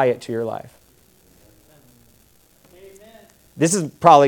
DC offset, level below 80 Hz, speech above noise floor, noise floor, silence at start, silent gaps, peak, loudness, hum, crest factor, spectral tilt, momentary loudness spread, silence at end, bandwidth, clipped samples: under 0.1%; -62 dBFS; 39 dB; -55 dBFS; 0 s; none; 0 dBFS; -20 LUFS; none; 20 dB; -5 dB/octave; 26 LU; 0 s; 18 kHz; under 0.1%